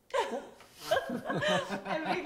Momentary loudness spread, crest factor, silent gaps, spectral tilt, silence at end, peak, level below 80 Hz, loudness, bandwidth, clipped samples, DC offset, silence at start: 12 LU; 18 dB; none; -4 dB/octave; 0 s; -16 dBFS; -68 dBFS; -33 LUFS; 16 kHz; under 0.1%; under 0.1%; 0.1 s